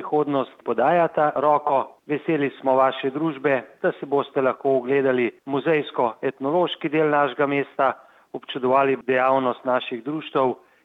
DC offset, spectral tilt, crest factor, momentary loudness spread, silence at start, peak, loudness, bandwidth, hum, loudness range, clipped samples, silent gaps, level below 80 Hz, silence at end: under 0.1%; -8 dB/octave; 16 dB; 7 LU; 0 s; -6 dBFS; -22 LUFS; 4.8 kHz; none; 1 LU; under 0.1%; none; -76 dBFS; 0.3 s